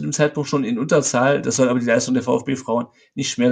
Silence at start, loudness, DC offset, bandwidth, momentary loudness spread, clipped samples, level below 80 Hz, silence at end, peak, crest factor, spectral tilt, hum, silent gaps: 0 s; -19 LUFS; under 0.1%; 9.6 kHz; 7 LU; under 0.1%; -60 dBFS; 0 s; -2 dBFS; 18 dB; -4.5 dB/octave; none; none